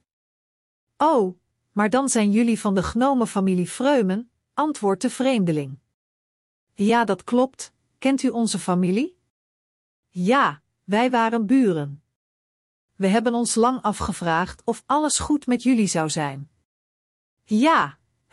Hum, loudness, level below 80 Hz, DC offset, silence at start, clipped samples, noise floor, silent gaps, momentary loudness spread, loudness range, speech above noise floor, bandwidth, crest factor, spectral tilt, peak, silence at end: none; -22 LUFS; -52 dBFS; under 0.1%; 1 s; under 0.1%; under -90 dBFS; 5.94-6.67 s, 9.30-10.03 s, 12.16-12.88 s, 16.65-17.37 s; 9 LU; 3 LU; over 69 dB; 12 kHz; 16 dB; -5 dB/octave; -8 dBFS; 0.4 s